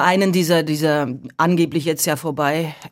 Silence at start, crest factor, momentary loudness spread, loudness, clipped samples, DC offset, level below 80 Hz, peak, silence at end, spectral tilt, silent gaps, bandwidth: 0 s; 16 dB; 5 LU; -19 LUFS; under 0.1%; under 0.1%; -64 dBFS; -2 dBFS; 0.05 s; -5 dB/octave; none; 16.5 kHz